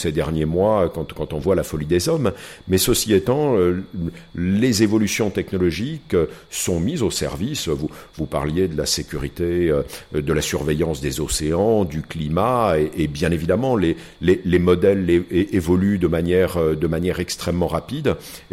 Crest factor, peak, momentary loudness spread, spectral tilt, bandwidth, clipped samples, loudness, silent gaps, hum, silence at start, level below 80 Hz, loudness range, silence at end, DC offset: 16 dB; -4 dBFS; 8 LU; -5.5 dB/octave; 16.5 kHz; under 0.1%; -20 LUFS; none; none; 0 s; -38 dBFS; 4 LU; 0.1 s; under 0.1%